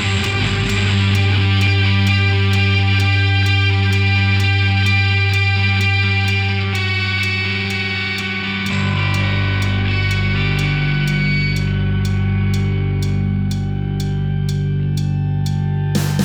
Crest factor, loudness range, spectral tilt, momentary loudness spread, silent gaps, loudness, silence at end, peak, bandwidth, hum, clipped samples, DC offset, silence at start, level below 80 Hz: 12 dB; 4 LU; -5.5 dB/octave; 5 LU; none; -17 LUFS; 0 s; -4 dBFS; 13 kHz; none; under 0.1%; under 0.1%; 0 s; -32 dBFS